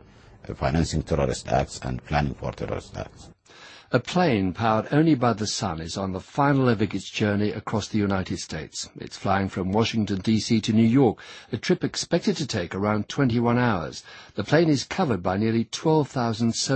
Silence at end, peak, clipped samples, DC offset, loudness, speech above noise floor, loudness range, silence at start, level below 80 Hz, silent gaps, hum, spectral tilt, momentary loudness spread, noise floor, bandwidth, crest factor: 0 s; -4 dBFS; under 0.1%; under 0.1%; -24 LUFS; 24 dB; 4 LU; 0.45 s; -44 dBFS; none; none; -5.5 dB/octave; 12 LU; -48 dBFS; 8.8 kHz; 20 dB